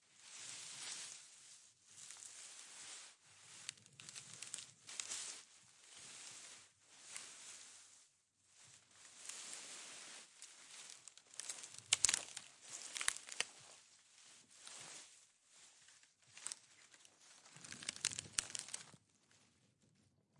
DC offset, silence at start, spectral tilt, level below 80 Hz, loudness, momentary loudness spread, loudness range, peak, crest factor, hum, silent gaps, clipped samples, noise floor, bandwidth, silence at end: under 0.1%; 0 s; 1.5 dB/octave; -84 dBFS; -46 LUFS; 21 LU; 14 LU; -6 dBFS; 44 dB; none; none; under 0.1%; -76 dBFS; 12 kHz; 0 s